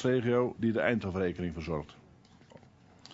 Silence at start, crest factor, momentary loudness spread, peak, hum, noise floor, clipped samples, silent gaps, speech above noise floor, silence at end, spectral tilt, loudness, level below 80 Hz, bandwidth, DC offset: 0 s; 20 dB; 10 LU; -12 dBFS; none; -58 dBFS; under 0.1%; none; 27 dB; 0 s; -7.5 dB/octave; -31 LUFS; -56 dBFS; 7.8 kHz; under 0.1%